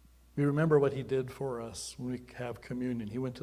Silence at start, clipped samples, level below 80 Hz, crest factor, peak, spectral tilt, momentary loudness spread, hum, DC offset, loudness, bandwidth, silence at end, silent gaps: 0.35 s; under 0.1%; -60 dBFS; 20 dB; -12 dBFS; -6.5 dB/octave; 14 LU; none; under 0.1%; -33 LUFS; 15 kHz; 0 s; none